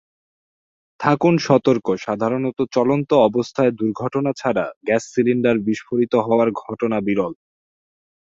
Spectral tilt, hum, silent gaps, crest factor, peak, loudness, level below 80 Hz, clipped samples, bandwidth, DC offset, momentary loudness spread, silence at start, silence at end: -7 dB/octave; none; 4.76-4.81 s; 18 dB; -2 dBFS; -19 LUFS; -60 dBFS; under 0.1%; 7.8 kHz; under 0.1%; 7 LU; 1 s; 1.05 s